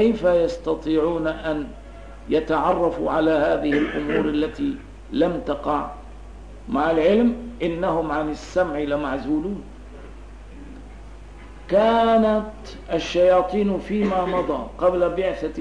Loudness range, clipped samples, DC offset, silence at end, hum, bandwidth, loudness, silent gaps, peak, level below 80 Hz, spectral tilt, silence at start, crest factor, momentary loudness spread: 5 LU; under 0.1%; 0.3%; 0 s; none; 10 kHz; -22 LUFS; none; -8 dBFS; -40 dBFS; -6.5 dB/octave; 0 s; 14 dB; 24 LU